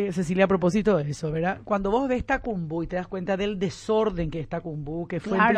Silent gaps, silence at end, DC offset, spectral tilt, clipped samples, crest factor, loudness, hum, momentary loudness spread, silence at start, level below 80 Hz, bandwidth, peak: none; 0 s; under 0.1%; -6.5 dB/octave; under 0.1%; 18 dB; -26 LUFS; none; 9 LU; 0 s; -44 dBFS; 10 kHz; -6 dBFS